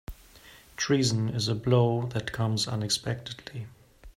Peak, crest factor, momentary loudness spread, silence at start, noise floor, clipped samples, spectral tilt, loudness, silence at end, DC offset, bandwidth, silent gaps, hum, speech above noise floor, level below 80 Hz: -10 dBFS; 18 dB; 18 LU; 0.1 s; -53 dBFS; under 0.1%; -5 dB/octave; -27 LUFS; 0.05 s; under 0.1%; 15 kHz; none; none; 25 dB; -54 dBFS